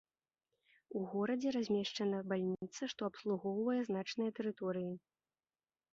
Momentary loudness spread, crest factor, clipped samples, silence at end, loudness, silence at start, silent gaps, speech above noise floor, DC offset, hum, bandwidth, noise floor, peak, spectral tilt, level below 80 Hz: 7 LU; 16 dB; under 0.1%; 0.95 s; -39 LUFS; 0.9 s; none; over 52 dB; under 0.1%; none; 7.6 kHz; under -90 dBFS; -24 dBFS; -5 dB/octave; -80 dBFS